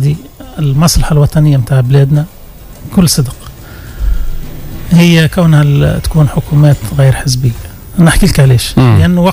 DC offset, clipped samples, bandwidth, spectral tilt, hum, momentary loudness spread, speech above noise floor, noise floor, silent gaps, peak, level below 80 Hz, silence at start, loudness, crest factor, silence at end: under 0.1%; 0.8%; 16 kHz; -6 dB/octave; none; 18 LU; 23 dB; -30 dBFS; none; 0 dBFS; -20 dBFS; 0 s; -9 LUFS; 8 dB; 0 s